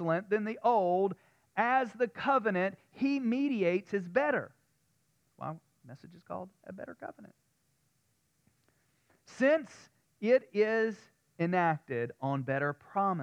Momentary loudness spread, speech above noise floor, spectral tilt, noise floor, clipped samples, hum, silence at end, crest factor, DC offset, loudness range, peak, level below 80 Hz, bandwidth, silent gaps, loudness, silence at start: 17 LU; 44 dB; -7.5 dB/octave; -76 dBFS; under 0.1%; none; 0 s; 18 dB; under 0.1%; 17 LU; -14 dBFS; -80 dBFS; 9.6 kHz; none; -31 LUFS; 0 s